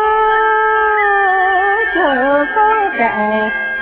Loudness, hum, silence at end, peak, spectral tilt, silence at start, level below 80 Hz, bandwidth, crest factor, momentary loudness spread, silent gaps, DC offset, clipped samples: -13 LUFS; none; 0 s; -2 dBFS; -7.5 dB/octave; 0 s; -44 dBFS; 4 kHz; 10 dB; 3 LU; none; under 0.1%; under 0.1%